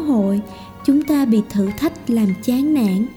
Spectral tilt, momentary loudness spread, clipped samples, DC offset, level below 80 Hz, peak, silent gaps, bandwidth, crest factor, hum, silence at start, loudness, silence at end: -7 dB/octave; 7 LU; under 0.1%; under 0.1%; -48 dBFS; -6 dBFS; none; 19 kHz; 12 dB; none; 0 s; -18 LUFS; 0 s